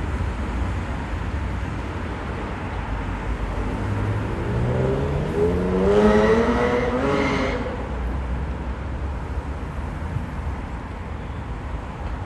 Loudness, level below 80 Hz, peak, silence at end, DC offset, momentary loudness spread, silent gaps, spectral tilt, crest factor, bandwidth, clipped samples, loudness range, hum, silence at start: -24 LUFS; -30 dBFS; -4 dBFS; 0 s; under 0.1%; 13 LU; none; -7.5 dB/octave; 20 dB; 11.5 kHz; under 0.1%; 10 LU; none; 0 s